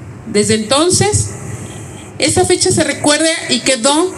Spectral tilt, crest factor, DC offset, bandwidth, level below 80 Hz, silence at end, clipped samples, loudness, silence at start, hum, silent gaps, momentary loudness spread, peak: -3 dB/octave; 14 dB; under 0.1%; 13 kHz; -42 dBFS; 0 s; under 0.1%; -12 LUFS; 0 s; none; none; 16 LU; 0 dBFS